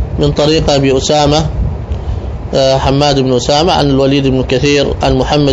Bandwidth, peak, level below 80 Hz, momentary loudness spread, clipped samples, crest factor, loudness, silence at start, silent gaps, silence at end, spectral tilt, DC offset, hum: 8 kHz; 0 dBFS; -22 dBFS; 9 LU; 0.1%; 10 dB; -11 LUFS; 0 s; none; 0 s; -5.5 dB/octave; 0.3%; none